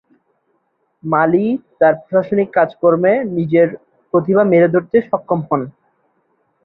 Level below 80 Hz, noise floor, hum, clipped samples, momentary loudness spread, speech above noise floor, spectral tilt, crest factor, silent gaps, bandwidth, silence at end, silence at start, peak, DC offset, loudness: -60 dBFS; -65 dBFS; none; under 0.1%; 8 LU; 51 dB; -11.5 dB/octave; 14 dB; none; 4.1 kHz; 0.95 s; 1.05 s; -2 dBFS; under 0.1%; -15 LUFS